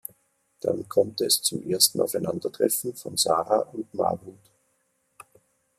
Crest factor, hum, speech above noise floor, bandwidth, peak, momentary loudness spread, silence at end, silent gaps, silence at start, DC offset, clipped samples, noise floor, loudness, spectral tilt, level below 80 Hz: 24 dB; none; 46 dB; 15.5 kHz; -2 dBFS; 10 LU; 1.45 s; none; 0.65 s; under 0.1%; under 0.1%; -71 dBFS; -25 LUFS; -3 dB/octave; -70 dBFS